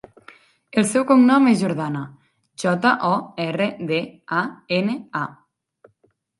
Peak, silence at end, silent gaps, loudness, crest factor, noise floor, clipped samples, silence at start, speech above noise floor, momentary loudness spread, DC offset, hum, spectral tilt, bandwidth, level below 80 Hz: -2 dBFS; 1.1 s; none; -20 LUFS; 20 dB; -64 dBFS; under 0.1%; 0.75 s; 45 dB; 13 LU; under 0.1%; none; -5.5 dB/octave; 11.5 kHz; -68 dBFS